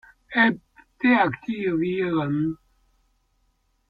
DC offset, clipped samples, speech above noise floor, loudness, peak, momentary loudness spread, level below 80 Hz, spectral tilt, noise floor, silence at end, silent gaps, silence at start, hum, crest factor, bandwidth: under 0.1%; under 0.1%; 46 dB; -23 LUFS; -6 dBFS; 9 LU; -60 dBFS; -8.5 dB/octave; -68 dBFS; 1.35 s; none; 0.3 s; none; 18 dB; 5 kHz